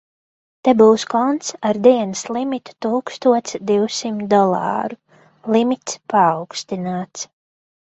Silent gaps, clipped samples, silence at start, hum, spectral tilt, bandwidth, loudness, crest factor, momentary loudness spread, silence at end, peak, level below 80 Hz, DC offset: none; under 0.1%; 0.65 s; none; -5 dB/octave; 8.2 kHz; -18 LUFS; 18 dB; 12 LU; 0.6 s; 0 dBFS; -64 dBFS; under 0.1%